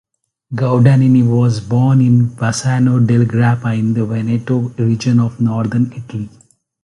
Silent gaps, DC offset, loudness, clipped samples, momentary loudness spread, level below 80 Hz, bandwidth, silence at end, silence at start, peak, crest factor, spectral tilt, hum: none; under 0.1%; -14 LUFS; under 0.1%; 9 LU; -48 dBFS; 11.5 kHz; 0.55 s; 0.5 s; 0 dBFS; 14 dB; -7.5 dB/octave; none